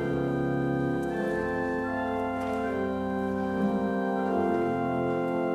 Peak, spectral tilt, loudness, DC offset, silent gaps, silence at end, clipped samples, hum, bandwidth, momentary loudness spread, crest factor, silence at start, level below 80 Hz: -16 dBFS; -8 dB/octave; -29 LUFS; under 0.1%; none; 0 s; under 0.1%; none; 13.5 kHz; 3 LU; 12 dB; 0 s; -54 dBFS